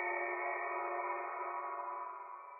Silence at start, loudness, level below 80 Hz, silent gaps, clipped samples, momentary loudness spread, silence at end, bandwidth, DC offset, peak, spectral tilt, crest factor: 0 s; -40 LUFS; under -90 dBFS; none; under 0.1%; 7 LU; 0 s; 2.7 kHz; under 0.1%; -26 dBFS; 10 dB/octave; 14 dB